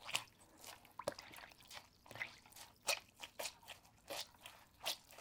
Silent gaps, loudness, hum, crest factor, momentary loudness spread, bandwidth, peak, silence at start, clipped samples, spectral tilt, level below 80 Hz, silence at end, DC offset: none; -48 LUFS; none; 34 dB; 16 LU; 18 kHz; -16 dBFS; 0 s; under 0.1%; -0.5 dB/octave; -78 dBFS; 0 s; under 0.1%